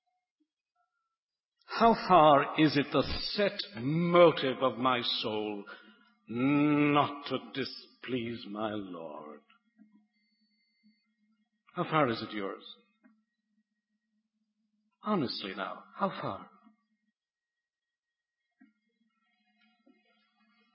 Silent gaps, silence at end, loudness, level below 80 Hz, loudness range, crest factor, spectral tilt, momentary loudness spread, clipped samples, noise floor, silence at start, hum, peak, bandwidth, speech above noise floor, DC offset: none; 4.3 s; -29 LUFS; -62 dBFS; 15 LU; 24 dB; -9.5 dB/octave; 20 LU; under 0.1%; under -90 dBFS; 1.7 s; none; -10 dBFS; 5.8 kHz; over 61 dB; under 0.1%